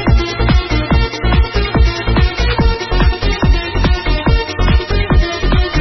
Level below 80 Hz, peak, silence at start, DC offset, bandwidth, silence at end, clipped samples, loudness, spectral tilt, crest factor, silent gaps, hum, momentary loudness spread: -14 dBFS; 0 dBFS; 0 s; under 0.1%; 6.2 kHz; 0 s; under 0.1%; -15 LUFS; -6.5 dB/octave; 12 dB; none; none; 1 LU